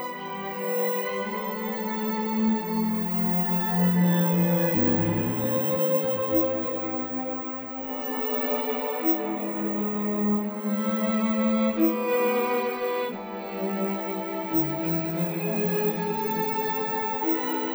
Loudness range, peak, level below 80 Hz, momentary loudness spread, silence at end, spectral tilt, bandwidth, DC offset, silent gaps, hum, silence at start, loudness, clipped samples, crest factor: 4 LU; -10 dBFS; -66 dBFS; 8 LU; 0 s; -7.5 dB/octave; over 20 kHz; under 0.1%; none; none; 0 s; -26 LUFS; under 0.1%; 16 dB